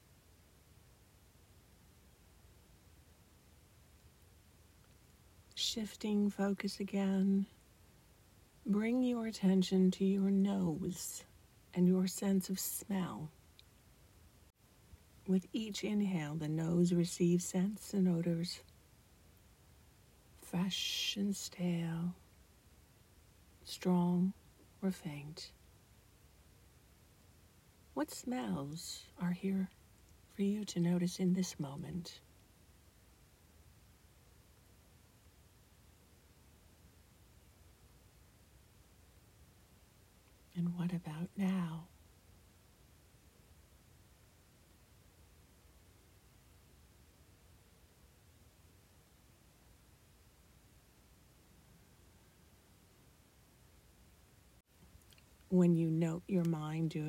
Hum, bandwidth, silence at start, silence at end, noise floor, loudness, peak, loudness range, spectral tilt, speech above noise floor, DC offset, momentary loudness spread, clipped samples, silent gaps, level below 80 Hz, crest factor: none; 16 kHz; 5.55 s; 0 s; -66 dBFS; -36 LUFS; -20 dBFS; 11 LU; -6 dB/octave; 30 dB; under 0.1%; 15 LU; under 0.1%; none; -68 dBFS; 20 dB